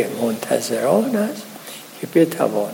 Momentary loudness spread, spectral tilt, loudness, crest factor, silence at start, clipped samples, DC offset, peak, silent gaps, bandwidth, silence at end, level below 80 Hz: 16 LU; -5 dB/octave; -20 LUFS; 18 dB; 0 s; under 0.1%; under 0.1%; -2 dBFS; none; 17 kHz; 0 s; -74 dBFS